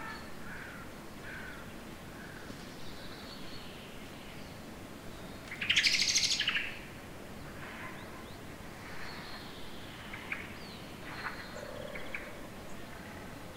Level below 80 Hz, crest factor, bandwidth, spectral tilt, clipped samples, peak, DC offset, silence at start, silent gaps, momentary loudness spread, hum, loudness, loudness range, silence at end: -56 dBFS; 26 dB; 16 kHz; -1.5 dB/octave; under 0.1%; -14 dBFS; under 0.1%; 0 s; none; 19 LU; none; -37 LUFS; 15 LU; 0 s